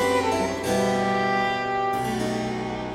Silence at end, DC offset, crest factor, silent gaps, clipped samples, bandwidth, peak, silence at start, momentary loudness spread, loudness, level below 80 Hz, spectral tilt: 0 s; under 0.1%; 14 dB; none; under 0.1%; 16 kHz; -10 dBFS; 0 s; 5 LU; -24 LUFS; -50 dBFS; -4.5 dB/octave